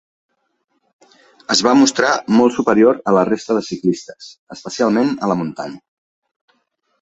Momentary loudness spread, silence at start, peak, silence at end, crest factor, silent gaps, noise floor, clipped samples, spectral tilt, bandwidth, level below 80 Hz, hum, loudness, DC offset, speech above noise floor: 19 LU; 1.5 s; 0 dBFS; 1.25 s; 18 dB; 4.39-4.47 s; -68 dBFS; under 0.1%; -4.5 dB/octave; 8.2 kHz; -60 dBFS; none; -16 LUFS; under 0.1%; 52 dB